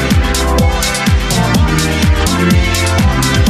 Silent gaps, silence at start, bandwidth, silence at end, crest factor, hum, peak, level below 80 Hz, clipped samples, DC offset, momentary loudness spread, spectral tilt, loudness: none; 0 s; 14 kHz; 0 s; 10 dB; none; 0 dBFS; -16 dBFS; under 0.1%; under 0.1%; 2 LU; -4.5 dB/octave; -12 LUFS